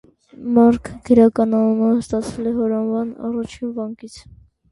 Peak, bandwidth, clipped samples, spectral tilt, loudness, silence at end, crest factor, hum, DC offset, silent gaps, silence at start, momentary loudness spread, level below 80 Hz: -2 dBFS; 11.5 kHz; under 0.1%; -7.5 dB/octave; -18 LUFS; 0.5 s; 16 dB; none; under 0.1%; none; 0.4 s; 15 LU; -48 dBFS